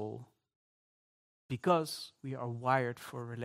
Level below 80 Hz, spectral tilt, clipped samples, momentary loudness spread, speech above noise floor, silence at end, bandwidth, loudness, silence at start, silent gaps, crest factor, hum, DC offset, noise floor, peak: -78 dBFS; -6 dB/octave; under 0.1%; 13 LU; over 55 dB; 0 s; 16 kHz; -35 LUFS; 0 s; 0.56-1.49 s; 22 dB; none; under 0.1%; under -90 dBFS; -14 dBFS